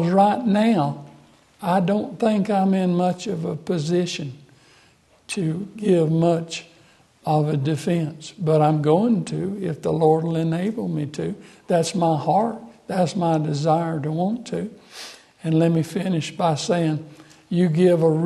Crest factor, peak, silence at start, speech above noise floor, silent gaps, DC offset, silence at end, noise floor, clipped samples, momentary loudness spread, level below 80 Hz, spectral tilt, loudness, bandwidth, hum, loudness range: 18 dB; -4 dBFS; 0 s; 36 dB; none; under 0.1%; 0 s; -56 dBFS; under 0.1%; 12 LU; -62 dBFS; -7 dB/octave; -22 LUFS; 12 kHz; none; 3 LU